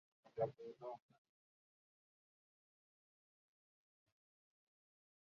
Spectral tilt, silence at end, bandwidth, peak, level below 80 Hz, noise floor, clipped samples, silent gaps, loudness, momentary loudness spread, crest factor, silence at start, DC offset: -7 dB/octave; 4.3 s; 6.8 kHz; -28 dBFS; under -90 dBFS; under -90 dBFS; under 0.1%; none; -48 LUFS; 11 LU; 28 dB; 0.25 s; under 0.1%